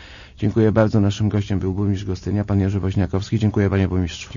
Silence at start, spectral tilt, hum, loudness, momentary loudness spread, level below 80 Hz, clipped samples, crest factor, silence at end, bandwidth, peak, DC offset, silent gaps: 0 s; -7.5 dB/octave; none; -20 LUFS; 7 LU; -40 dBFS; under 0.1%; 16 dB; 0 s; 7.4 kHz; -2 dBFS; under 0.1%; none